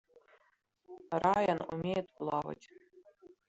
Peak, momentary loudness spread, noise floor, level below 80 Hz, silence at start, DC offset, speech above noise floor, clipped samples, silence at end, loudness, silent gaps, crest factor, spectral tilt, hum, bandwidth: -16 dBFS; 21 LU; -75 dBFS; -68 dBFS; 0.9 s; under 0.1%; 41 dB; under 0.1%; 0.2 s; -34 LUFS; none; 22 dB; -7 dB/octave; none; 8.2 kHz